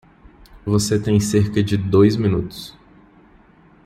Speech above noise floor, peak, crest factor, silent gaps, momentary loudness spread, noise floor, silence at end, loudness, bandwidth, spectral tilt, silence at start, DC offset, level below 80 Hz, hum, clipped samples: 33 dB; -2 dBFS; 18 dB; none; 17 LU; -50 dBFS; 1.15 s; -18 LUFS; 14 kHz; -6.5 dB/octave; 0.55 s; under 0.1%; -46 dBFS; none; under 0.1%